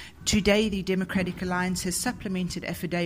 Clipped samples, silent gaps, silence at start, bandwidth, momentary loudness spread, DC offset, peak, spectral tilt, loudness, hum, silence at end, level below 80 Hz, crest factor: under 0.1%; none; 0 s; 16 kHz; 8 LU; under 0.1%; -8 dBFS; -4.5 dB/octave; -27 LUFS; none; 0 s; -44 dBFS; 20 dB